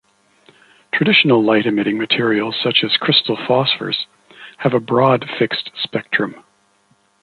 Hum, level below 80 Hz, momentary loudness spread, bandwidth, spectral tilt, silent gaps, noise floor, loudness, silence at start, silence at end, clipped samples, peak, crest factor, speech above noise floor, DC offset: none; -62 dBFS; 10 LU; 9.8 kHz; -7 dB/octave; none; -59 dBFS; -16 LUFS; 0.95 s; 0.85 s; under 0.1%; 0 dBFS; 18 dB; 42 dB; under 0.1%